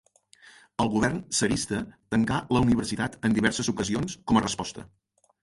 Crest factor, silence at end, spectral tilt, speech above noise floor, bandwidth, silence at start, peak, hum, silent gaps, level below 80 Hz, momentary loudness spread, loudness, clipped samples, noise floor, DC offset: 20 dB; 0.55 s; -4.5 dB/octave; 30 dB; 11.5 kHz; 0.8 s; -6 dBFS; none; none; -48 dBFS; 8 LU; -26 LUFS; under 0.1%; -56 dBFS; under 0.1%